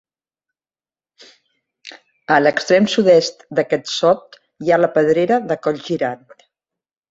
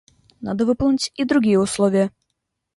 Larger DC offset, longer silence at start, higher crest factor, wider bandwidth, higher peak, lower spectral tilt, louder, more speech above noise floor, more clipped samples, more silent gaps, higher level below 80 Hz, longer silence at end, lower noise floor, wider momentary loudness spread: neither; first, 1.85 s vs 0.4 s; about the same, 18 dB vs 14 dB; second, 8 kHz vs 11.5 kHz; first, -2 dBFS vs -6 dBFS; about the same, -5 dB/octave vs -5.5 dB/octave; first, -17 LUFS vs -20 LUFS; first, over 74 dB vs 59 dB; neither; neither; second, -62 dBFS vs -48 dBFS; first, 0.95 s vs 0.7 s; first, under -90 dBFS vs -77 dBFS; about the same, 9 LU vs 9 LU